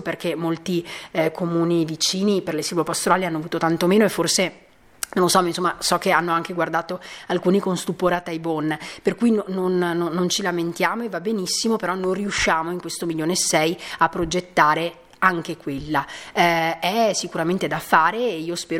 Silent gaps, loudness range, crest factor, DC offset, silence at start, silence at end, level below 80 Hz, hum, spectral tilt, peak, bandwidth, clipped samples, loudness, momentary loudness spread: none; 2 LU; 20 dB; under 0.1%; 0 s; 0 s; -52 dBFS; none; -4 dB/octave; 0 dBFS; 17 kHz; under 0.1%; -21 LUFS; 8 LU